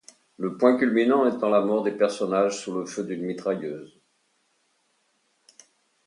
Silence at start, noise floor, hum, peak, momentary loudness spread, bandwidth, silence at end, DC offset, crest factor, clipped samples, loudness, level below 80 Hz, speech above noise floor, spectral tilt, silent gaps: 0.4 s; -70 dBFS; none; -6 dBFS; 11 LU; 11 kHz; 2.2 s; under 0.1%; 20 dB; under 0.1%; -24 LUFS; -78 dBFS; 46 dB; -5.5 dB/octave; none